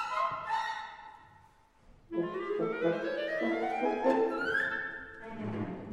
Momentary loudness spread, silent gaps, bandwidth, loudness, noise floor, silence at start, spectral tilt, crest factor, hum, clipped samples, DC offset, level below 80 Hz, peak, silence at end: 12 LU; none; 12 kHz; -33 LUFS; -62 dBFS; 0 s; -6 dB/octave; 18 dB; none; under 0.1%; under 0.1%; -66 dBFS; -16 dBFS; 0 s